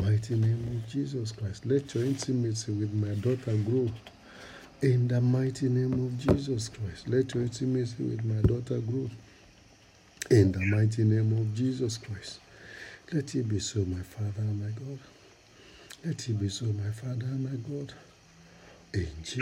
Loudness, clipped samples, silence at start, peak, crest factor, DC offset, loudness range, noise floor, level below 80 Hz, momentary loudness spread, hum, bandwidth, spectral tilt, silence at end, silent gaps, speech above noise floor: -30 LUFS; under 0.1%; 0 s; -10 dBFS; 20 dB; under 0.1%; 7 LU; -58 dBFS; -52 dBFS; 16 LU; none; 11.5 kHz; -7 dB/octave; 0 s; none; 29 dB